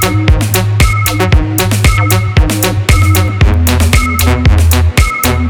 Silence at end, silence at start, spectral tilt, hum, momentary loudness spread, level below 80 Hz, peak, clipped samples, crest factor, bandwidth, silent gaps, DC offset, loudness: 0 s; 0 s; -5 dB/octave; none; 2 LU; -14 dBFS; 0 dBFS; under 0.1%; 8 dB; over 20 kHz; none; under 0.1%; -10 LUFS